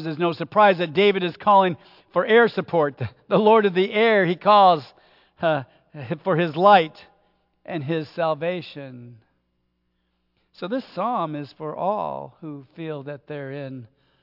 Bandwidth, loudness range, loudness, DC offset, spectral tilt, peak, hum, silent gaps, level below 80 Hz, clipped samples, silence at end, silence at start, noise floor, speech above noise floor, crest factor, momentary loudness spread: 5.8 kHz; 12 LU; -20 LUFS; under 0.1%; -8 dB/octave; -2 dBFS; none; none; -72 dBFS; under 0.1%; 0.4 s; 0 s; -72 dBFS; 51 dB; 20 dB; 20 LU